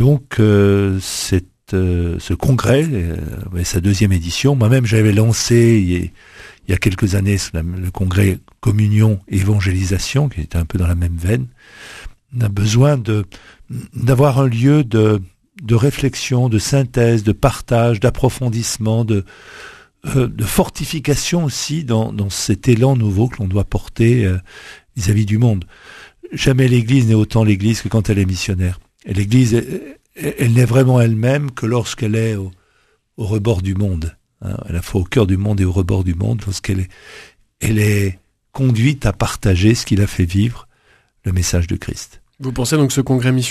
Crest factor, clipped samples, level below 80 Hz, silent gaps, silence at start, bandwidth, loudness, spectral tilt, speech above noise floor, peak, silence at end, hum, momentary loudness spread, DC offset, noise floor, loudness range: 16 dB; under 0.1%; -34 dBFS; none; 0 s; 14 kHz; -16 LUFS; -6 dB/octave; 44 dB; 0 dBFS; 0 s; none; 13 LU; under 0.1%; -59 dBFS; 4 LU